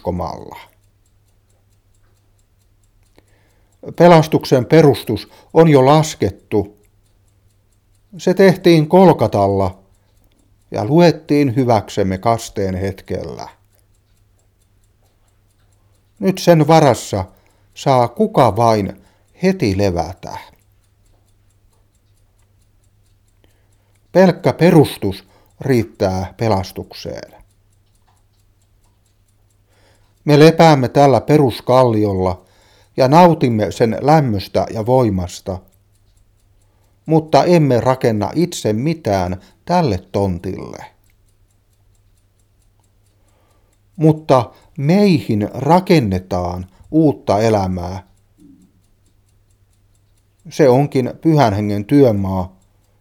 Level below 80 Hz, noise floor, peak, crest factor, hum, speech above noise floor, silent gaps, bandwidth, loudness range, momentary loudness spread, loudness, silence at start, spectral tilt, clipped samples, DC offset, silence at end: -48 dBFS; -56 dBFS; 0 dBFS; 16 dB; none; 43 dB; none; 16.5 kHz; 11 LU; 18 LU; -14 LUFS; 0.05 s; -7 dB/octave; under 0.1%; under 0.1%; 0.55 s